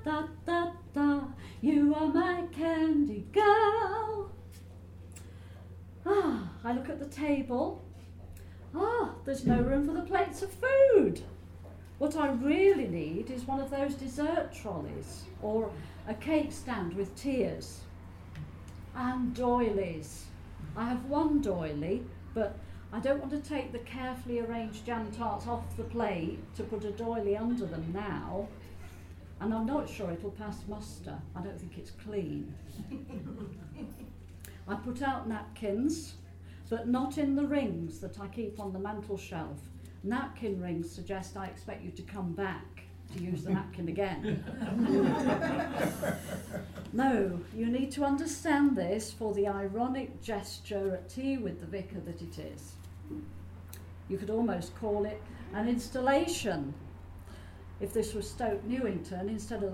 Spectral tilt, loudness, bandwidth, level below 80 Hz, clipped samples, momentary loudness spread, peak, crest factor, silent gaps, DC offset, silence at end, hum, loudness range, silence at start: -6.5 dB/octave; -33 LUFS; 16 kHz; -52 dBFS; under 0.1%; 19 LU; -10 dBFS; 22 dB; none; under 0.1%; 0 s; none; 10 LU; 0 s